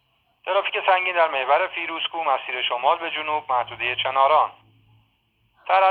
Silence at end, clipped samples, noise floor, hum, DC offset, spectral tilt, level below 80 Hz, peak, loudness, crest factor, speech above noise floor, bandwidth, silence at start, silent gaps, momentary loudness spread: 0 s; under 0.1%; -66 dBFS; none; under 0.1%; -5.5 dB/octave; -68 dBFS; -4 dBFS; -22 LUFS; 18 dB; 44 dB; 4.7 kHz; 0.45 s; none; 7 LU